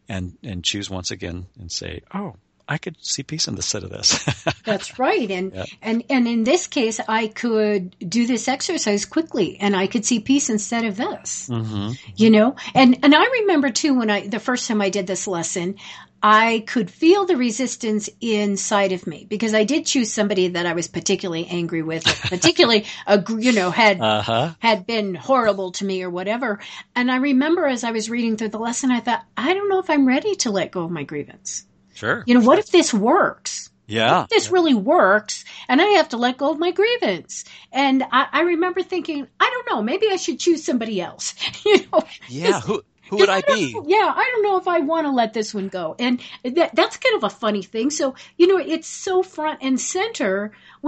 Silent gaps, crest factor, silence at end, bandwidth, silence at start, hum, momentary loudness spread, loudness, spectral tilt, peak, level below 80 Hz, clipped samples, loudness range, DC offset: none; 20 dB; 0 s; 9 kHz; 0.1 s; none; 12 LU; -20 LUFS; -3.5 dB/octave; 0 dBFS; -58 dBFS; under 0.1%; 4 LU; under 0.1%